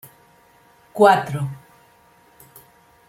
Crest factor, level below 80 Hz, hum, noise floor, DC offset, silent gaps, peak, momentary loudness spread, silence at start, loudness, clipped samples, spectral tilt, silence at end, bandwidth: 22 dB; -64 dBFS; none; -54 dBFS; under 0.1%; none; -2 dBFS; 23 LU; 0.95 s; -18 LUFS; under 0.1%; -6 dB/octave; 1.5 s; 16.5 kHz